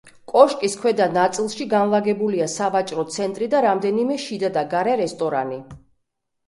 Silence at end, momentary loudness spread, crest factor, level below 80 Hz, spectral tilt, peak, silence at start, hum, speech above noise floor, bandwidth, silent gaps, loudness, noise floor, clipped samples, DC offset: 0.7 s; 9 LU; 20 dB; -62 dBFS; -4.5 dB/octave; 0 dBFS; 0.05 s; none; 54 dB; 11.5 kHz; none; -21 LUFS; -74 dBFS; under 0.1%; under 0.1%